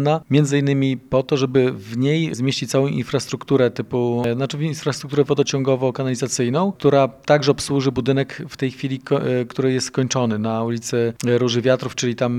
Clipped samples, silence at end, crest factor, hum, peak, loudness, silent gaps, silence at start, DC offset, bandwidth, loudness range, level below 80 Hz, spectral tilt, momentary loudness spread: under 0.1%; 0 s; 18 dB; none; 0 dBFS; -20 LUFS; none; 0 s; under 0.1%; 13.5 kHz; 2 LU; -56 dBFS; -5.5 dB/octave; 6 LU